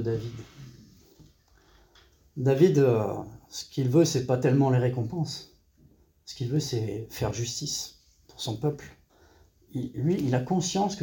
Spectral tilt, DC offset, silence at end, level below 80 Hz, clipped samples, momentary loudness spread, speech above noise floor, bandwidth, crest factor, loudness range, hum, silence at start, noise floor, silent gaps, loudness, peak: -6 dB/octave; under 0.1%; 0 s; -56 dBFS; under 0.1%; 17 LU; 34 dB; 17 kHz; 20 dB; 8 LU; none; 0 s; -60 dBFS; none; -27 LUFS; -8 dBFS